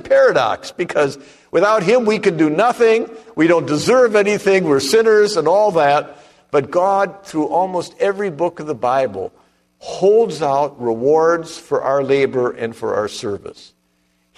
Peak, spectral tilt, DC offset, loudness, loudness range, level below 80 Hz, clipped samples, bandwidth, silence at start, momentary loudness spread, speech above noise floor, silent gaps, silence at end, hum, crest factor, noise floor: -2 dBFS; -5 dB/octave; under 0.1%; -16 LUFS; 5 LU; -58 dBFS; under 0.1%; 13 kHz; 0.05 s; 10 LU; 47 dB; none; 0.85 s; none; 14 dB; -62 dBFS